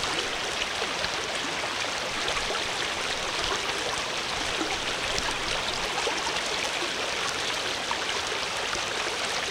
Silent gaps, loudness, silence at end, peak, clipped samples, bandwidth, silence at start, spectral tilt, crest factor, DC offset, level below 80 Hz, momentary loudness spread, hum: none; -27 LUFS; 0 s; -6 dBFS; under 0.1%; 18 kHz; 0 s; -1 dB/octave; 24 dB; under 0.1%; -50 dBFS; 1 LU; none